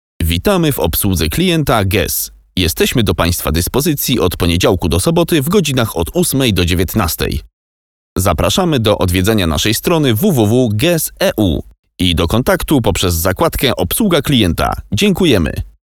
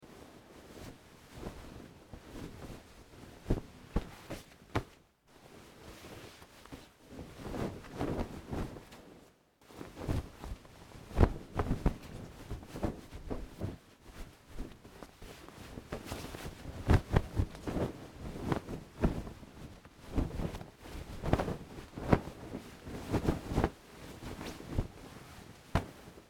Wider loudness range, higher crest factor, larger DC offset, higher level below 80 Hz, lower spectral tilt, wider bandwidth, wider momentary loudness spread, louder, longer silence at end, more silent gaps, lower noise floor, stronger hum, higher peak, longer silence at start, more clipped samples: second, 2 LU vs 10 LU; second, 14 dB vs 32 dB; first, 0.4% vs under 0.1%; first, -28 dBFS vs -44 dBFS; second, -5 dB/octave vs -7 dB/octave; first, over 20 kHz vs 18 kHz; second, 5 LU vs 20 LU; first, -14 LUFS vs -38 LUFS; first, 0.25 s vs 0.05 s; first, 7.53-8.16 s, 11.79-11.83 s vs none; first, under -90 dBFS vs -63 dBFS; neither; first, 0 dBFS vs -8 dBFS; first, 0.2 s vs 0 s; neither